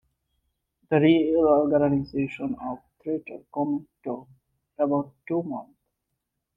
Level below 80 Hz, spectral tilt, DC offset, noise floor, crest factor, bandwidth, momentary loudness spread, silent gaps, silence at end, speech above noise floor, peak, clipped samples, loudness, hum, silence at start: -60 dBFS; -9.5 dB/octave; under 0.1%; -81 dBFS; 18 dB; 5.4 kHz; 16 LU; none; 0.95 s; 57 dB; -8 dBFS; under 0.1%; -25 LUFS; none; 0.9 s